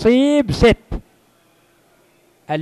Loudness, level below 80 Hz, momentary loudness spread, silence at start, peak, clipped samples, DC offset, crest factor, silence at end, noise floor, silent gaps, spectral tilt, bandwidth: -16 LUFS; -34 dBFS; 19 LU; 0 s; 0 dBFS; under 0.1%; under 0.1%; 18 dB; 0 s; -56 dBFS; none; -6.5 dB/octave; 13 kHz